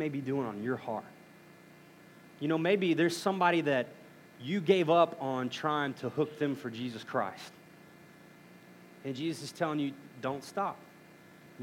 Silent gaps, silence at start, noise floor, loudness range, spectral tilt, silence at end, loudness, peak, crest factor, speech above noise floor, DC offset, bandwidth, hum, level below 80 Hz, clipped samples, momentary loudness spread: none; 0 s; -56 dBFS; 9 LU; -6 dB/octave; 0 s; -32 LUFS; -12 dBFS; 22 dB; 24 dB; under 0.1%; 16.5 kHz; none; -84 dBFS; under 0.1%; 14 LU